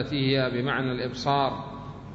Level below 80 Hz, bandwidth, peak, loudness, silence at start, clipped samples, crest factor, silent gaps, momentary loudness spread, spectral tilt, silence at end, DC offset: -52 dBFS; 7.8 kHz; -10 dBFS; -26 LUFS; 0 s; under 0.1%; 18 dB; none; 13 LU; -6.5 dB/octave; 0 s; under 0.1%